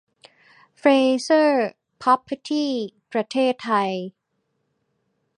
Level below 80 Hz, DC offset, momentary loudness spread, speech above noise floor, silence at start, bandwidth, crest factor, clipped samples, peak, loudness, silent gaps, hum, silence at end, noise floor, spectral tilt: -76 dBFS; under 0.1%; 11 LU; 53 dB; 0.85 s; 11 kHz; 20 dB; under 0.1%; -4 dBFS; -21 LUFS; none; none; 1.3 s; -74 dBFS; -4.5 dB/octave